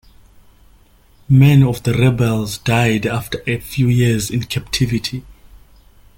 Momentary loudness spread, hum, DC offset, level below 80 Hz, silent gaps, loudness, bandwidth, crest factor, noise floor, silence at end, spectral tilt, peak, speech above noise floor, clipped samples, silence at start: 11 LU; none; under 0.1%; -40 dBFS; none; -16 LUFS; 17 kHz; 16 dB; -49 dBFS; 0.85 s; -6 dB/octave; -2 dBFS; 34 dB; under 0.1%; 1.3 s